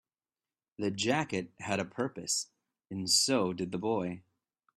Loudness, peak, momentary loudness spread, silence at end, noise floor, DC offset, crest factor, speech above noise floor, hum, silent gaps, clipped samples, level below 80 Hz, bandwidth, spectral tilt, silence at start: -32 LUFS; -12 dBFS; 13 LU; 0.55 s; under -90 dBFS; under 0.1%; 22 dB; over 58 dB; none; none; under 0.1%; -72 dBFS; 15.5 kHz; -3 dB/octave; 0.8 s